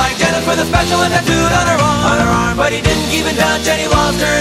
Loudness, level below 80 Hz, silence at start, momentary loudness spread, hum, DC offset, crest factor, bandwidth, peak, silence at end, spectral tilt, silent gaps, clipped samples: -13 LUFS; -26 dBFS; 0 s; 2 LU; none; under 0.1%; 12 dB; 16 kHz; 0 dBFS; 0 s; -4 dB/octave; none; under 0.1%